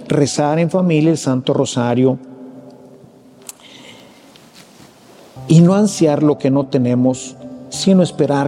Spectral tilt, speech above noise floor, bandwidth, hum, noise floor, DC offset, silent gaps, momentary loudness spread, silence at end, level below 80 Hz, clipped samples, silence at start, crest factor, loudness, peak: -6.5 dB/octave; 30 dB; 13 kHz; none; -44 dBFS; under 0.1%; none; 23 LU; 0 s; -58 dBFS; under 0.1%; 0 s; 16 dB; -15 LUFS; 0 dBFS